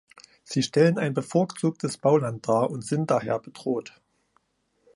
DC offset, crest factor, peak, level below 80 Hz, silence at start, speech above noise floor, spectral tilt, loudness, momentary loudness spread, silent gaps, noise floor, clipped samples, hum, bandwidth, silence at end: under 0.1%; 18 dB; -8 dBFS; -68 dBFS; 0.5 s; 47 dB; -6 dB/octave; -25 LUFS; 9 LU; none; -71 dBFS; under 0.1%; none; 11.5 kHz; 1.05 s